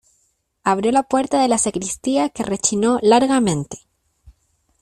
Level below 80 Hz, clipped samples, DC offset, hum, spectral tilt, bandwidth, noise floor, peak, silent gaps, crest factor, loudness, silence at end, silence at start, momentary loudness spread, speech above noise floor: -54 dBFS; under 0.1%; under 0.1%; none; -4 dB/octave; 13.5 kHz; -66 dBFS; -2 dBFS; none; 18 dB; -18 LUFS; 0.5 s; 0.65 s; 10 LU; 48 dB